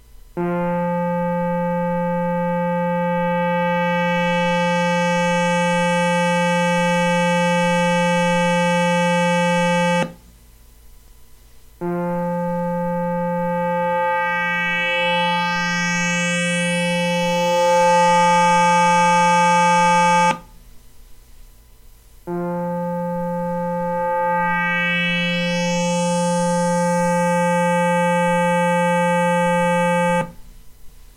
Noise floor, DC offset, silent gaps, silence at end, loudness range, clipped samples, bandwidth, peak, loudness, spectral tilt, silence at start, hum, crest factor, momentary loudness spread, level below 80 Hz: -47 dBFS; under 0.1%; none; 0.15 s; 8 LU; under 0.1%; 16 kHz; -4 dBFS; -18 LUFS; -5 dB/octave; 0.35 s; none; 16 dB; 8 LU; -48 dBFS